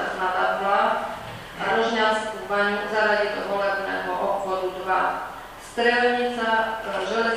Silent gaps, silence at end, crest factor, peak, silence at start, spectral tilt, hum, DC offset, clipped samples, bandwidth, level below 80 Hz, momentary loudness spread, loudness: none; 0 s; 16 dB; -6 dBFS; 0 s; -4 dB/octave; none; under 0.1%; under 0.1%; 15.5 kHz; -54 dBFS; 9 LU; -23 LUFS